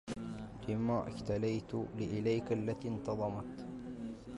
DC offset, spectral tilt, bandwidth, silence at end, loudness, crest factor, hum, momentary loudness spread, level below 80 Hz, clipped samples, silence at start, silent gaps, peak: under 0.1%; -7.5 dB/octave; 11.5 kHz; 0 s; -38 LUFS; 14 dB; none; 10 LU; -58 dBFS; under 0.1%; 0.05 s; none; -24 dBFS